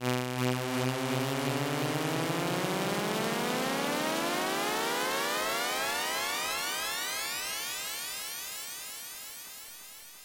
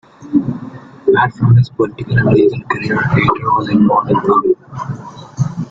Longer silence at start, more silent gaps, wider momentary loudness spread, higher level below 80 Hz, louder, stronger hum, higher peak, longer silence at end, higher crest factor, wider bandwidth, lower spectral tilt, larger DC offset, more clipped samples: second, 0 s vs 0.2 s; neither; second, 9 LU vs 14 LU; second, -68 dBFS vs -42 dBFS; second, -31 LUFS vs -14 LUFS; neither; second, -16 dBFS vs 0 dBFS; about the same, 0 s vs 0 s; about the same, 16 dB vs 14 dB; first, 17 kHz vs 7.4 kHz; second, -3 dB/octave vs -8.5 dB/octave; neither; neither